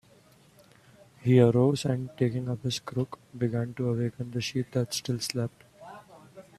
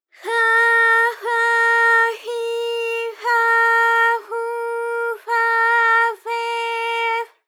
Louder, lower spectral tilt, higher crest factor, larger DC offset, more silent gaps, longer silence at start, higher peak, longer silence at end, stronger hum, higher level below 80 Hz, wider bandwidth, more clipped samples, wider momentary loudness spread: second, -28 LUFS vs -17 LUFS; first, -6.5 dB/octave vs 3 dB/octave; first, 22 dB vs 14 dB; neither; neither; first, 1.2 s vs 0.2 s; about the same, -8 dBFS vs -6 dBFS; about the same, 0.15 s vs 0.2 s; neither; first, -62 dBFS vs under -90 dBFS; second, 14 kHz vs 18 kHz; neither; first, 14 LU vs 11 LU